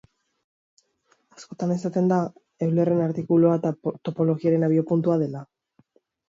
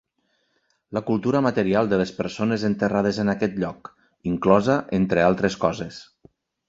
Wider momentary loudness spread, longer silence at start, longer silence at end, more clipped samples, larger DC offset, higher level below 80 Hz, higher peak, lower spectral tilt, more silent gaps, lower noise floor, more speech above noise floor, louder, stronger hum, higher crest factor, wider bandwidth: about the same, 10 LU vs 12 LU; first, 1.4 s vs 0.9 s; first, 0.85 s vs 0.65 s; neither; neither; second, -68 dBFS vs -52 dBFS; second, -8 dBFS vs -2 dBFS; first, -9.5 dB/octave vs -7 dB/octave; neither; about the same, -67 dBFS vs -70 dBFS; about the same, 45 dB vs 48 dB; about the same, -23 LUFS vs -22 LUFS; neither; second, 16 dB vs 22 dB; about the same, 7.6 kHz vs 7.8 kHz